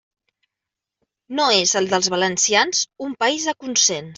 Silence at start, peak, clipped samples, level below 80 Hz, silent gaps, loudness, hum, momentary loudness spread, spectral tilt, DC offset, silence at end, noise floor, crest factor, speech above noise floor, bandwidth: 1.3 s; -2 dBFS; under 0.1%; -66 dBFS; none; -18 LUFS; none; 7 LU; -1 dB/octave; under 0.1%; 0.05 s; -85 dBFS; 18 dB; 65 dB; 8.2 kHz